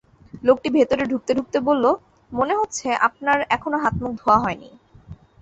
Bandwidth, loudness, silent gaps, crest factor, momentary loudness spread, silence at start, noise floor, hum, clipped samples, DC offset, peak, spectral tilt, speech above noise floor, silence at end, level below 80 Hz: 8.2 kHz; -21 LUFS; none; 18 dB; 6 LU; 0.35 s; -44 dBFS; none; under 0.1%; under 0.1%; -4 dBFS; -5 dB/octave; 23 dB; 0.25 s; -48 dBFS